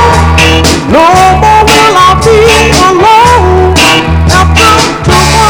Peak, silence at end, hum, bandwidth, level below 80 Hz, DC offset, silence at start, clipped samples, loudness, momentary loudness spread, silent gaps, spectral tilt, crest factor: 0 dBFS; 0 s; none; over 20 kHz; -14 dBFS; under 0.1%; 0 s; 10%; -4 LUFS; 3 LU; none; -4 dB/octave; 4 dB